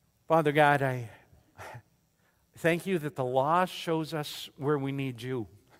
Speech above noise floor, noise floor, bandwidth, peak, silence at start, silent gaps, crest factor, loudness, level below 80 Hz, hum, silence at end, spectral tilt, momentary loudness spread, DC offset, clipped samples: 41 dB; -70 dBFS; 16 kHz; -8 dBFS; 0.3 s; none; 22 dB; -29 LUFS; -68 dBFS; none; 0.35 s; -6 dB/octave; 19 LU; under 0.1%; under 0.1%